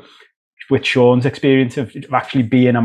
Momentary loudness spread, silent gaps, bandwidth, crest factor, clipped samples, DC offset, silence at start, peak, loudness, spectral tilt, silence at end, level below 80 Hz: 8 LU; none; 9.6 kHz; 16 dB; under 0.1%; under 0.1%; 0.6 s; 0 dBFS; -15 LUFS; -7 dB/octave; 0 s; -54 dBFS